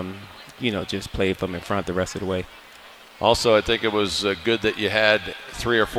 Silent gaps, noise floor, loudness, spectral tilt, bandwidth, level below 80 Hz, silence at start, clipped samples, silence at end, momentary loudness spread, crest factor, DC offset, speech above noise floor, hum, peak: none; -46 dBFS; -22 LUFS; -4 dB/octave; 16.5 kHz; -44 dBFS; 0 s; under 0.1%; 0 s; 11 LU; 22 dB; under 0.1%; 23 dB; none; 0 dBFS